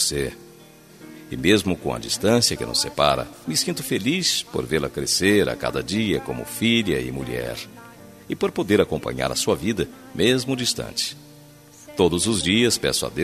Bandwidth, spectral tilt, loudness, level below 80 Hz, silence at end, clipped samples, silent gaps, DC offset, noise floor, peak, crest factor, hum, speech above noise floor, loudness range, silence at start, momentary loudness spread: 14 kHz; -3.5 dB/octave; -22 LUFS; -46 dBFS; 0 s; under 0.1%; none; under 0.1%; -47 dBFS; -2 dBFS; 20 dB; none; 25 dB; 3 LU; 0 s; 10 LU